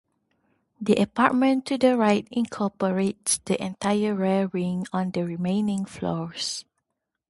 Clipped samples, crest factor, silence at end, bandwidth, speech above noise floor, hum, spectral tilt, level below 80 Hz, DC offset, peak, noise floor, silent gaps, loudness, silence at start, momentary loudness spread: under 0.1%; 22 dB; 0.7 s; 11.5 kHz; 57 dB; none; -5 dB/octave; -62 dBFS; under 0.1%; -2 dBFS; -81 dBFS; none; -25 LUFS; 0.8 s; 9 LU